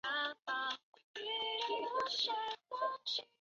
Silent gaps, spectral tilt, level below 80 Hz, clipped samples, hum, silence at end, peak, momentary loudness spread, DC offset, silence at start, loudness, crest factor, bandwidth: 0.83-0.93 s, 1.04-1.14 s; 3.5 dB/octave; -86 dBFS; under 0.1%; none; 0.15 s; -24 dBFS; 7 LU; under 0.1%; 0.05 s; -38 LUFS; 16 dB; 7.6 kHz